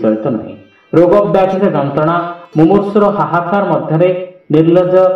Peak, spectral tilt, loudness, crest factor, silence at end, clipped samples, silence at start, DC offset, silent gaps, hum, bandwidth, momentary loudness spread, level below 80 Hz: 0 dBFS; -9.5 dB/octave; -12 LUFS; 12 dB; 0 s; under 0.1%; 0 s; under 0.1%; none; none; 6.2 kHz; 9 LU; -48 dBFS